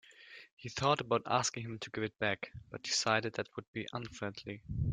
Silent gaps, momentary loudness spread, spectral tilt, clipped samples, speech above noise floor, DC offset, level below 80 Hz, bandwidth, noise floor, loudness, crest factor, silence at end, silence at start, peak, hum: 0.52-0.57 s, 3.68-3.73 s; 15 LU; -3.5 dB/octave; under 0.1%; 20 dB; under 0.1%; -58 dBFS; 9.6 kHz; -56 dBFS; -36 LUFS; 22 dB; 0 s; 0.1 s; -14 dBFS; none